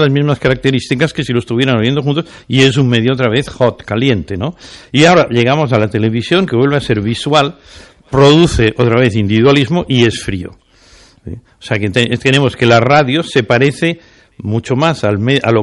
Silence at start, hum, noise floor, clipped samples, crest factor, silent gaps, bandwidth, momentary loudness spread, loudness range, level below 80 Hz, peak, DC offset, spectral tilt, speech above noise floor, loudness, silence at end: 0 s; none; -44 dBFS; under 0.1%; 12 dB; none; 11.5 kHz; 11 LU; 2 LU; -36 dBFS; 0 dBFS; under 0.1%; -6 dB/octave; 32 dB; -12 LUFS; 0 s